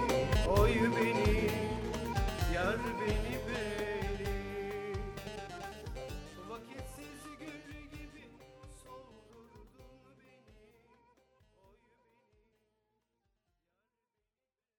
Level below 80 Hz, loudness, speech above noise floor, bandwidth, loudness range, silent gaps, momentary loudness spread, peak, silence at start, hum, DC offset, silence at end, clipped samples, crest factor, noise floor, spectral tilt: -44 dBFS; -35 LUFS; over 59 dB; 19.5 kHz; 24 LU; none; 22 LU; -14 dBFS; 0 s; none; under 0.1%; 4.3 s; under 0.1%; 22 dB; under -90 dBFS; -5.5 dB/octave